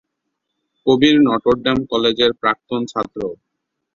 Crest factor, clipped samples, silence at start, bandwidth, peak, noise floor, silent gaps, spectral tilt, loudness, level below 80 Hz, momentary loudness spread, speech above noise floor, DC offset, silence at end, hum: 18 dB; under 0.1%; 0.85 s; 7.6 kHz; 0 dBFS; -76 dBFS; none; -5.5 dB/octave; -17 LUFS; -50 dBFS; 11 LU; 60 dB; under 0.1%; 0.6 s; none